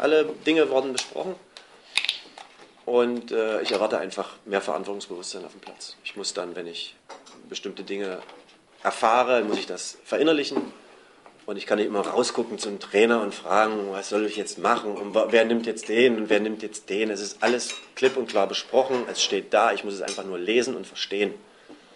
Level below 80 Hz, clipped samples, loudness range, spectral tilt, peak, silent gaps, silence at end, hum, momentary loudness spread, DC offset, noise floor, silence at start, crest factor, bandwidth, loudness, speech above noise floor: -72 dBFS; under 0.1%; 9 LU; -3 dB/octave; -6 dBFS; none; 0.2 s; none; 14 LU; under 0.1%; -52 dBFS; 0 s; 20 dB; 11.5 kHz; -25 LUFS; 27 dB